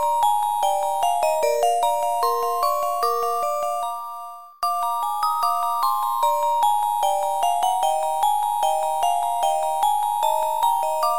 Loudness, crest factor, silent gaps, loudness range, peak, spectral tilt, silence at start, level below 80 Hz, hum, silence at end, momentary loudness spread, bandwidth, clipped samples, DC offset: -22 LUFS; 12 dB; none; 3 LU; -8 dBFS; 0.5 dB/octave; 0 s; -64 dBFS; none; 0 s; 4 LU; 17 kHz; under 0.1%; 1%